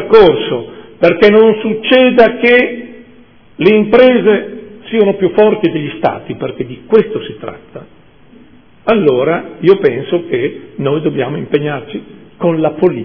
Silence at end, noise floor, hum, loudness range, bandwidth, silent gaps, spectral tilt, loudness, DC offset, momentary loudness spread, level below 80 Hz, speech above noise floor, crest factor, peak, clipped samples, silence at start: 0 s; -43 dBFS; none; 6 LU; 5.4 kHz; none; -8.5 dB/octave; -11 LUFS; 0.5%; 15 LU; -46 dBFS; 32 dB; 12 dB; 0 dBFS; 1%; 0 s